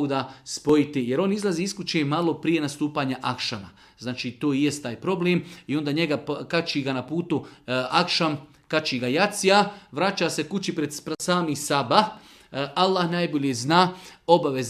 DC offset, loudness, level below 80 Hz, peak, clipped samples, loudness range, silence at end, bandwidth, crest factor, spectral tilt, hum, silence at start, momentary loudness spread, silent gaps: under 0.1%; -24 LUFS; -64 dBFS; -2 dBFS; under 0.1%; 3 LU; 0 s; 15 kHz; 24 dB; -4.5 dB/octave; none; 0 s; 9 LU; none